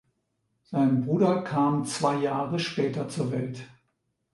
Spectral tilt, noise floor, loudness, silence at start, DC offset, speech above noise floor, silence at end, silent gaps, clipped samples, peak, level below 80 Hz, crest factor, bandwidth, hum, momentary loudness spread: -6.5 dB/octave; -76 dBFS; -27 LUFS; 0.7 s; under 0.1%; 50 dB; 0.65 s; none; under 0.1%; -10 dBFS; -68 dBFS; 18 dB; 11.5 kHz; none; 8 LU